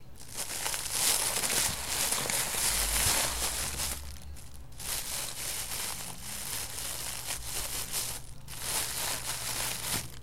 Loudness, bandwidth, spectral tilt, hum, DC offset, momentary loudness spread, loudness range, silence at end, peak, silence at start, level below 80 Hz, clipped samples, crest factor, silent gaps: -30 LUFS; 16.5 kHz; -0.5 dB/octave; none; 0.6%; 12 LU; 7 LU; 0 s; -8 dBFS; 0 s; -46 dBFS; under 0.1%; 24 dB; none